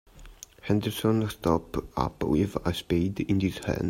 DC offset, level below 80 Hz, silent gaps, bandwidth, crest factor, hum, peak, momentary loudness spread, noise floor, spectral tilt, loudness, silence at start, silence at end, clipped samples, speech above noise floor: under 0.1%; -46 dBFS; none; 16 kHz; 20 dB; none; -8 dBFS; 7 LU; -48 dBFS; -6.5 dB/octave; -28 LUFS; 0.15 s; 0 s; under 0.1%; 21 dB